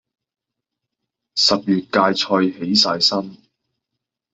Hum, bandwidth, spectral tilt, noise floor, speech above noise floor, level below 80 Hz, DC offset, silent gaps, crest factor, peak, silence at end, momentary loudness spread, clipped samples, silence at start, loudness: none; 8.4 kHz; -3.5 dB/octave; -82 dBFS; 64 dB; -62 dBFS; under 0.1%; none; 20 dB; -2 dBFS; 1 s; 9 LU; under 0.1%; 1.35 s; -17 LUFS